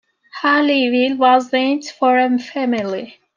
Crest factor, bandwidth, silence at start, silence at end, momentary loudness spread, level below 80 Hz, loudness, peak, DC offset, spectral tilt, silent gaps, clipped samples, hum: 14 dB; 7.4 kHz; 0.35 s; 0.25 s; 8 LU; -70 dBFS; -16 LUFS; -2 dBFS; under 0.1%; -4 dB/octave; none; under 0.1%; none